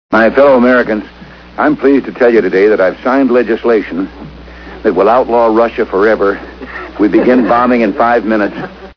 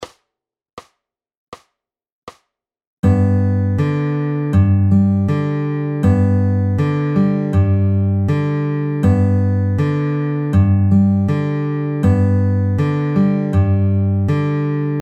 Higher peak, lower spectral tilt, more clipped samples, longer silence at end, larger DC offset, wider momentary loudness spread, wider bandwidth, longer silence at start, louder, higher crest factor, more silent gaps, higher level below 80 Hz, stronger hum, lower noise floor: about the same, 0 dBFS vs -2 dBFS; second, -7.5 dB/octave vs -10 dB/octave; first, 0.4% vs under 0.1%; about the same, 0.05 s vs 0 s; neither; first, 16 LU vs 5 LU; first, 5.4 kHz vs 4.9 kHz; about the same, 0.1 s vs 0 s; first, -10 LUFS vs -16 LUFS; about the same, 10 dB vs 14 dB; second, none vs 0.73-0.77 s, 1.37-1.52 s, 2.12-2.27 s, 2.87-3.03 s; about the same, -38 dBFS vs -42 dBFS; neither; second, -30 dBFS vs -84 dBFS